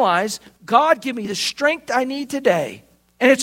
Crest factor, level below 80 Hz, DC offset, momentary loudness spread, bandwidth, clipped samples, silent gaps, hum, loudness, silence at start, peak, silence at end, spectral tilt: 18 dB; -64 dBFS; under 0.1%; 9 LU; 16.5 kHz; under 0.1%; none; none; -19 LUFS; 0 s; 0 dBFS; 0 s; -3 dB/octave